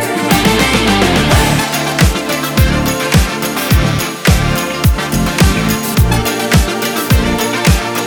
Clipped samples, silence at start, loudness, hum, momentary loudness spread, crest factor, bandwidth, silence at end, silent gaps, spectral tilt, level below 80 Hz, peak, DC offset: under 0.1%; 0 s; -12 LUFS; none; 4 LU; 12 dB; over 20 kHz; 0 s; none; -4.5 dB/octave; -20 dBFS; 0 dBFS; under 0.1%